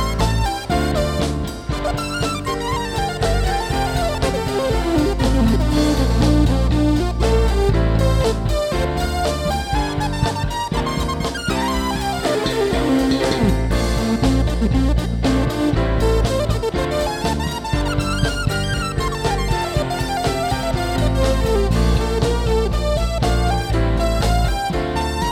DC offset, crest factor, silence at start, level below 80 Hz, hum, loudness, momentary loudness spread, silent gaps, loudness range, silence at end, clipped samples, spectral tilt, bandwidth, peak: under 0.1%; 14 dB; 0 s; -22 dBFS; none; -19 LUFS; 5 LU; none; 4 LU; 0 s; under 0.1%; -5.5 dB/octave; 15.5 kHz; -4 dBFS